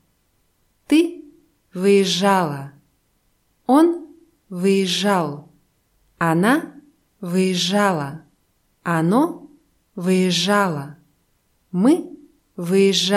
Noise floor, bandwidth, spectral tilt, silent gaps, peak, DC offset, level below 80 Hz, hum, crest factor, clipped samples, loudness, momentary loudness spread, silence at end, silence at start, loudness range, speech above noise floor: -65 dBFS; 15.5 kHz; -5 dB/octave; none; -4 dBFS; under 0.1%; -66 dBFS; none; 16 dB; under 0.1%; -19 LUFS; 21 LU; 0 s; 0.9 s; 2 LU; 47 dB